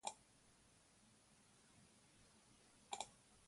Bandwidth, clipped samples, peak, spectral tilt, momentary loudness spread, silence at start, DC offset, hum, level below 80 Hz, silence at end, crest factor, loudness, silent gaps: 11.5 kHz; under 0.1%; -28 dBFS; -1 dB/octave; 17 LU; 0.05 s; under 0.1%; none; -84 dBFS; 0 s; 32 dB; -54 LUFS; none